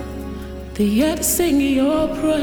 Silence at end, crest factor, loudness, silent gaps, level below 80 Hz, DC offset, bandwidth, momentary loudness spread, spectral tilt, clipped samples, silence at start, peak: 0 s; 14 dB; -18 LUFS; none; -36 dBFS; under 0.1%; over 20 kHz; 14 LU; -4.5 dB/octave; under 0.1%; 0 s; -6 dBFS